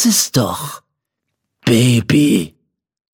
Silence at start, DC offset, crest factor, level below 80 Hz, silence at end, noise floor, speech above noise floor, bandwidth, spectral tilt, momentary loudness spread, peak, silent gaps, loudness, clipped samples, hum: 0 s; under 0.1%; 16 dB; -50 dBFS; 0.65 s; -76 dBFS; 63 dB; 17.5 kHz; -4.5 dB/octave; 14 LU; 0 dBFS; none; -14 LUFS; under 0.1%; none